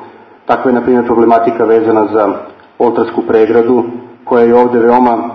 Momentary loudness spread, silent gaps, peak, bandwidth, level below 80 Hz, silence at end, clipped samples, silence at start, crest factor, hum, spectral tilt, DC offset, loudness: 7 LU; none; 0 dBFS; 5.8 kHz; -48 dBFS; 0 s; 0.2%; 0 s; 10 dB; none; -9 dB/octave; under 0.1%; -10 LUFS